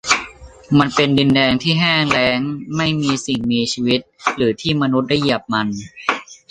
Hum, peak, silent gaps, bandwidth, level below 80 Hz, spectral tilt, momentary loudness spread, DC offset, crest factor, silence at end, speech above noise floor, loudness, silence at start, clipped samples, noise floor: none; -2 dBFS; none; 10 kHz; -48 dBFS; -4.5 dB/octave; 8 LU; under 0.1%; 16 dB; 0.15 s; 20 dB; -17 LUFS; 0.05 s; under 0.1%; -37 dBFS